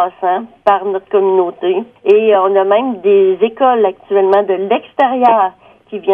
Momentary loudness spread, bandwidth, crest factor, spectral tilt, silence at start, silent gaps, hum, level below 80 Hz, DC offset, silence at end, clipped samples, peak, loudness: 7 LU; 3.8 kHz; 12 dB; -7.5 dB/octave; 0 s; none; none; -62 dBFS; under 0.1%; 0 s; under 0.1%; 0 dBFS; -13 LUFS